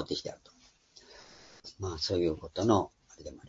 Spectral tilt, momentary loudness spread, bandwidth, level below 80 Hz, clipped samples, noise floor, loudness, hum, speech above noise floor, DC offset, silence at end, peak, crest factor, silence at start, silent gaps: -5.5 dB/octave; 25 LU; 7.8 kHz; -58 dBFS; under 0.1%; -61 dBFS; -32 LUFS; none; 29 dB; under 0.1%; 0 s; -10 dBFS; 24 dB; 0 s; none